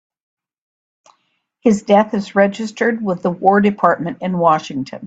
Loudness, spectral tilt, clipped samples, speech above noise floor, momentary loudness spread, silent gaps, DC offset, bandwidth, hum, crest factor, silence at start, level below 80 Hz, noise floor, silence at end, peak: -16 LUFS; -6.5 dB/octave; under 0.1%; 51 dB; 7 LU; none; under 0.1%; 8 kHz; none; 18 dB; 1.65 s; -60 dBFS; -66 dBFS; 0 s; 0 dBFS